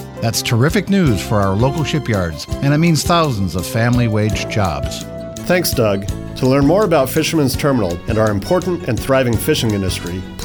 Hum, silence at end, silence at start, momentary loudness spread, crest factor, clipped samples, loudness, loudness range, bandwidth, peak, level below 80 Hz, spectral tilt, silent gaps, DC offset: none; 0 s; 0 s; 7 LU; 12 dB; under 0.1%; -16 LUFS; 1 LU; over 20 kHz; -4 dBFS; -34 dBFS; -5.5 dB/octave; none; under 0.1%